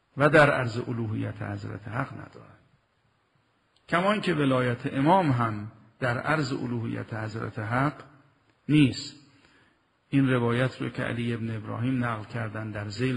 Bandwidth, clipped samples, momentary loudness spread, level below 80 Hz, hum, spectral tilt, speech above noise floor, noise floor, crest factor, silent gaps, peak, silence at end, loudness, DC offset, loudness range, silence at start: 11.5 kHz; under 0.1%; 13 LU; -58 dBFS; none; -7 dB/octave; 43 dB; -69 dBFS; 20 dB; none; -6 dBFS; 0 s; -27 LUFS; under 0.1%; 5 LU; 0.15 s